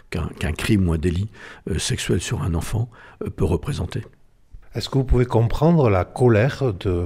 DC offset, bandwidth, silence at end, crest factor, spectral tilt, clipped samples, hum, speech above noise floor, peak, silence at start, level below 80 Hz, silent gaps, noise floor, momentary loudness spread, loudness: under 0.1%; 15.5 kHz; 0 s; 16 dB; -6.5 dB/octave; under 0.1%; none; 24 dB; -4 dBFS; 0.1 s; -32 dBFS; none; -45 dBFS; 14 LU; -21 LUFS